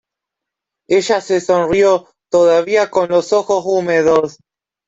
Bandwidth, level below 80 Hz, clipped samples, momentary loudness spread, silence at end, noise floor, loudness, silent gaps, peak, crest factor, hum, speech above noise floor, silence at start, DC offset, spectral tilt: 8 kHz; -54 dBFS; under 0.1%; 5 LU; 0.6 s; -82 dBFS; -14 LUFS; none; -2 dBFS; 12 dB; none; 69 dB; 0.9 s; under 0.1%; -4.5 dB/octave